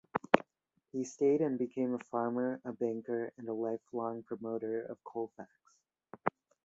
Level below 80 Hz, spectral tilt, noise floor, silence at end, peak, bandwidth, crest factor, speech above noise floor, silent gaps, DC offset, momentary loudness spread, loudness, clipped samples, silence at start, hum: -76 dBFS; -5.5 dB/octave; -76 dBFS; 0.35 s; -8 dBFS; 8 kHz; 28 dB; 40 dB; none; under 0.1%; 11 LU; -36 LUFS; under 0.1%; 0.15 s; none